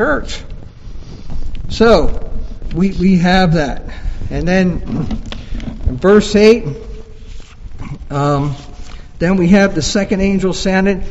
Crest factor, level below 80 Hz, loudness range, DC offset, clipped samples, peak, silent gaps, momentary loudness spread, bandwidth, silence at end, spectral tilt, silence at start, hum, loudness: 14 dB; -24 dBFS; 2 LU; under 0.1%; 0.2%; 0 dBFS; none; 22 LU; 8.2 kHz; 0 s; -6 dB/octave; 0 s; none; -14 LUFS